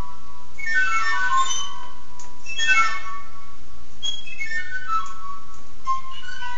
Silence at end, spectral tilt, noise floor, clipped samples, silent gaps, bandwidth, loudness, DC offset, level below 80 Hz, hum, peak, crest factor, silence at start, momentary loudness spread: 0 s; 1 dB/octave; -46 dBFS; under 0.1%; none; 8 kHz; -24 LUFS; 20%; -52 dBFS; none; -4 dBFS; 20 dB; 0 s; 23 LU